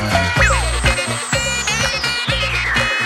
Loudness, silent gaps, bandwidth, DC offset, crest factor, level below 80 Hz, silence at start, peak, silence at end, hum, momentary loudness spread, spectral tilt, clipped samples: -16 LUFS; none; 15.5 kHz; under 0.1%; 16 dB; -26 dBFS; 0 s; -2 dBFS; 0 s; none; 4 LU; -3 dB/octave; under 0.1%